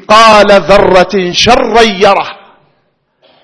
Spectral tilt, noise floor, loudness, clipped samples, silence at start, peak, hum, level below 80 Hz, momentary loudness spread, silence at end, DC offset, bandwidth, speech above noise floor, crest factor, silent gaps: -3.5 dB/octave; -57 dBFS; -5 LUFS; 7%; 0.1 s; 0 dBFS; none; -30 dBFS; 7 LU; 1.1 s; under 0.1%; 11 kHz; 52 dB; 8 dB; none